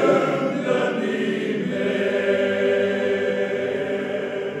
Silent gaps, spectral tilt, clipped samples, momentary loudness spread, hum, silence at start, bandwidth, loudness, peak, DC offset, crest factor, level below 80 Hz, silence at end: none; -6 dB/octave; under 0.1%; 5 LU; none; 0 s; 10.5 kHz; -22 LUFS; -6 dBFS; under 0.1%; 16 dB; -76 dBFS; 0 s